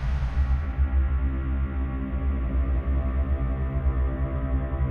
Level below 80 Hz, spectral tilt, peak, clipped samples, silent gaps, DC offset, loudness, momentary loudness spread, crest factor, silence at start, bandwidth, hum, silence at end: -26 dBFS; -10 dB/octave; -14 dBFS; under 0.1%; none; under 0.1%; -27 LUFS; 3 LU; 10 dB; 0 s; 3.6 kHz; none; 0 s